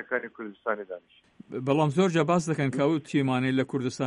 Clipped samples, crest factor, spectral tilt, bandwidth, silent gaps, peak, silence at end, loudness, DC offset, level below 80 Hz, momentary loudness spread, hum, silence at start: under 0.1%; 18 dB; -6.5 dB/octave; 11 kHz; none; -10 dBFS; 0 s; -27 LUFS; under 0.1%; -68 dBFS; 14 LU; none; 0 s